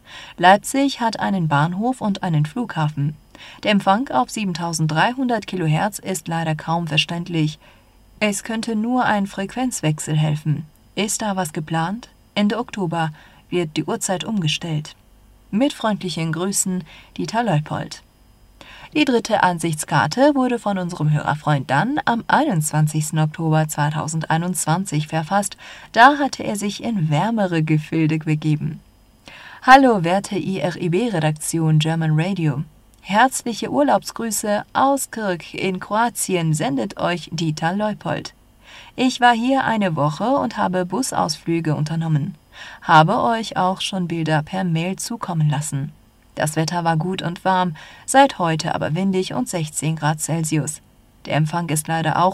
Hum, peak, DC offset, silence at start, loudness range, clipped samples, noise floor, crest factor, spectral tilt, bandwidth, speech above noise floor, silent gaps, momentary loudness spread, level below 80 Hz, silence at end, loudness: none; 0 dBFS; under 0.1%; 0.1 s; 5 LU; under 0.1%; -51 dBFS; 20 dB; -5 dB/octave; 14.5 kHz; 31 dB; none; 10 LU; -54 dBFS; 0 s; -20 LUFS